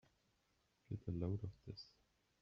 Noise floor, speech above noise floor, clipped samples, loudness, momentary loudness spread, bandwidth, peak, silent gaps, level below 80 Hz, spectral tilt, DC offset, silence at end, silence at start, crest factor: -82 dBFS; 35 dB; under 0.1%; -48 LUFS; 12 LU; 6.6 kHz; -30 dBFS; none; -68 dBFS; -8.5 dB/octave; under 0.1%; 0.55 s; 0.9 s; 20 dB